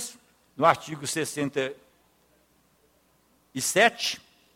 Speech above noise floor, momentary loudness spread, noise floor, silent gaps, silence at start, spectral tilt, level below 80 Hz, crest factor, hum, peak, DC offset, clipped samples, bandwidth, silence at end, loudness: 40 dB; 15 LU; -65 dBFS; none; 0 s; -2.5 dB/octave; -72 dBFS; 24 dB; none; -4 dBFS; under 0.1%; under 0.1%; 17 kHz; 0.4 s; -25 LUFS